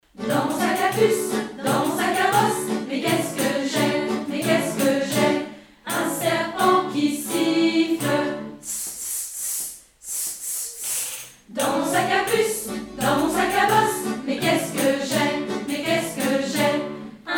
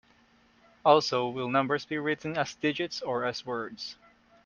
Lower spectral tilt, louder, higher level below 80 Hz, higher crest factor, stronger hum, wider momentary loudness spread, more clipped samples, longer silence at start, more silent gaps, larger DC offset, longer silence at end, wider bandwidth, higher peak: about the same, -3.5 dB/octave vs -4.5 dB/octave; first, -22 LUFS vs -29 LUFS; first, -58 dBFS vs -70 dBFS; second, 18 dB vs 24 dB; neither; second, 8 LU vs 12 LU; neither; second, 0.15 s vs 0.85 s; neither; neither; second, 0 s vs 0.5 s; first, over 20 kHz vs 7.4 kHz; about the same, -6 dBFS vs -6 dBFS